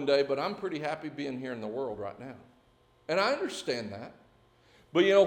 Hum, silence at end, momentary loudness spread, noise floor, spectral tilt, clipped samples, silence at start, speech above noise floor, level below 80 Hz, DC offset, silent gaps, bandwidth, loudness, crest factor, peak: none; 0 s; 19 LU; -64 dBFS; -5 dB/octave; under 0.1%; 0 s; 35 dB; -72 dBFS; under 0.1%; none; 15 kHz; -32 LUFS; 20 dB; -10 dBFS